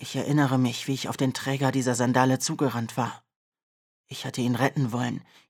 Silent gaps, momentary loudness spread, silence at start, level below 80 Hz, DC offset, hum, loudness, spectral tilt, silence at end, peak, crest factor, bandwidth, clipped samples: 3.36-3.52 s, 3.63-4.04 s; 9 LU; 0 s; -72 dBFS; under 0.1%; none; -26 LUFS; -5.5 dB/octave; 0.25 s; -4 dBFS; 22 dB; 16.5 kHz; under 0.1%